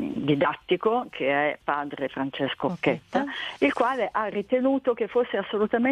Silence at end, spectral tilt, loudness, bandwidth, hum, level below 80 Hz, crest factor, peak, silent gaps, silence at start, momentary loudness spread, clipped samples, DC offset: 0 s; -7 dB/octave; -26 LUFS; 10.5 kHz; none; -64 dBFS; 16 dB; -8 dBFS; none; 0 s; 5 LU; under 0.1%; under 0.1%